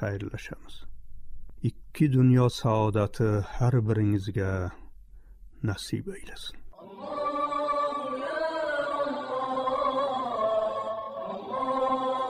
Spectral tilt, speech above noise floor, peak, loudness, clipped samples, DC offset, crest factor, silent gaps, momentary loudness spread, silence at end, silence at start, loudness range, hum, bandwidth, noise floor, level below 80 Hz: -7.5 dB/octave; 22 dB; -12 dBFS; -28 LUFS; under 0.1%; under 0.1%; 16 dB; none; 13 LU; 0 s; 0 s; 7 LU; none; 12.5 kHz; -48 dBFS; -50 dBFS